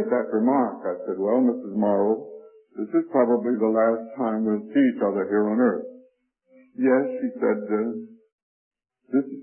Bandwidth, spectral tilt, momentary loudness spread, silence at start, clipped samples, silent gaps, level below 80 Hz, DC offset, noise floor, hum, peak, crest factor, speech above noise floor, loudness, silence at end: 3.2 kHz; -12 dB/octave; 9 LU; 0 s; under 0.1%; 8.32-8.71 s; -74 dBFS; under 0.1%; -62 dBFS; none; -8 dBFS; 16 dB; 40 dB; -23 LUFS; 0 s